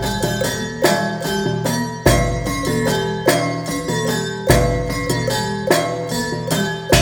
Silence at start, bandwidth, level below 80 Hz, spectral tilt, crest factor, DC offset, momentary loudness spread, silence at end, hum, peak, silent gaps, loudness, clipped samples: 0 s; over 20 kHz; -32 dBFS; -4.5 dB/octave; 18 dB; under 0.1%; 6 LU; 0 s; none; 0 dBFS; none; -19 LUFS; under 0.1%